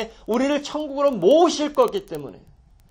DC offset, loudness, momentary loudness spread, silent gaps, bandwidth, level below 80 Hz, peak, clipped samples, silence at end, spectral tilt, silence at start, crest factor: under 0.1%; -20 LUFS; 17 LU; none; 17 kHz; -54 dBFS; -6 dBFS; under 0.1%; 0.55 s; -4.5 dB/octave; 0 s; 16 dB